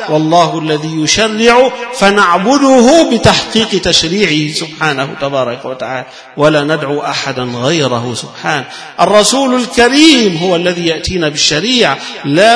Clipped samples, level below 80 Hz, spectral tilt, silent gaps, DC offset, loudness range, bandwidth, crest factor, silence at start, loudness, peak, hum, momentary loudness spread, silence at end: 0.9%; -40 dBFS; -3.5 dB/octave; none; under 0.1%; 6 LU; 11 kHz; 10 dB; 0 s; -10 LUFS; 0 dBFS; none; 11 LU; 0 s